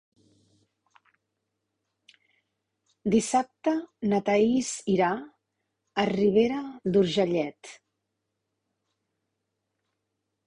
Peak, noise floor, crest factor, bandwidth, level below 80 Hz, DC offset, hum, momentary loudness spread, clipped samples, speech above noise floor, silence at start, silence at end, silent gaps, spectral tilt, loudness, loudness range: -10 dBFS; -82 dBFS; 20 dB; 11 kHz; -64 dBFS; under 0.1%; none; 12 LU; under 0.1%; 57 dB; 3.05 s; 2.7 s; none; -5.5 dB/octave; -26 LUFS; 7 LU